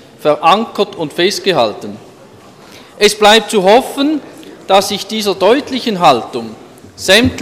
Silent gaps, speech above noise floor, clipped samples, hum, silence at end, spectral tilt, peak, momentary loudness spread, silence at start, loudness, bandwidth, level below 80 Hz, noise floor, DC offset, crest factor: none; 27 dB; under 0.1%; none; 0 s; -3.5 dB/octave; 0 dBFS; 13 LU; 0.2 s; -12 LUFS; 17 kHz; -46 dBFS; -39 dBFS; under 0.1%; 14 dB